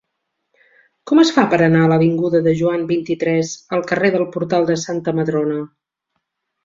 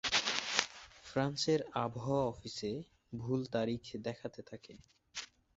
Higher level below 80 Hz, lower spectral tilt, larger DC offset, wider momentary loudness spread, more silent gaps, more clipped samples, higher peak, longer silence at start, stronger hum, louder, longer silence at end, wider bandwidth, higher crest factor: first, -58 dBFS vs -66 dBFS; first, -6.5 dB/octave vs -3 dB/octave; neither; second, 8 LU vs 16 LU; neither; neither; about the same, -2 dBFS vs -4 dBFS; first, 1.05 s vs 0.05 s; neither; first, -17 LUFS vs -37 LUFS; first, 1 s vs 0.3 s; about the same, 7.6 kHz vs 8 kHz; second, 16 dB vs 34 dB